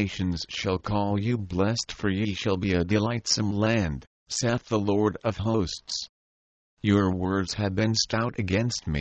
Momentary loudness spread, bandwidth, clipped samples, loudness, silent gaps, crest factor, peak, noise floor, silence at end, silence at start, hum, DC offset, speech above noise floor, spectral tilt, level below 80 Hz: 6 LU; 8.6 kHz; under 0.1%; -26 LUFS; 4.07-4.26 s, 6.09-6.77 s; 18 dB; -8 dBFS; under -90 dBFS; 0 s; 0 s; none; under 0.1%; over 64 dB; -5 dB/octave; -48 dBFS